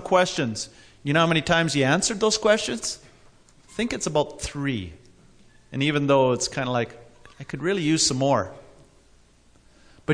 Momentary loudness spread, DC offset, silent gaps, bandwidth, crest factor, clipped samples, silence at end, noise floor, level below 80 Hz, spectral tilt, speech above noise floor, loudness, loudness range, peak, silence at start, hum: 16 LU; under 0.1%; none; 11 kHz; 18 dB; under 0.1%; 0 s; -56 dBFS; -52 dBFS; -4 dB/octave; 33 dB; -23 LUFS; 4 LU; -6 dBFS; 0 s; none